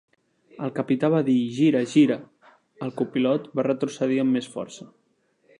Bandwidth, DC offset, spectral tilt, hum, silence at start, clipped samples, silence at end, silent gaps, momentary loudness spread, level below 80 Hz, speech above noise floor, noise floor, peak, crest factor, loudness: 10.5 kHz; under 0.1%; -6.5 dB/octave; none; 0.6 s; under 0.1%; 0.75 s; none; 15 LU; -76 dBFS; 43 dB; -65 dBFS; -6 dBFS; 18 dB; -23 LUFS